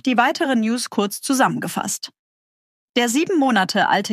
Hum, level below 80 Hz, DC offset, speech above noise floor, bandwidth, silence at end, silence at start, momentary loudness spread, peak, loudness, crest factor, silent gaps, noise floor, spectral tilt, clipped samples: none; -72 dBFS; under 0.1%; over 71 dB; 15.5 kHz; 0 s; 0.05 s; 7 LU; -4 dBFS; -19 LUFS; 16 dB; 2.19-2.94 s; under -90 dBFS; -3.5 dB/octave; under 0.1%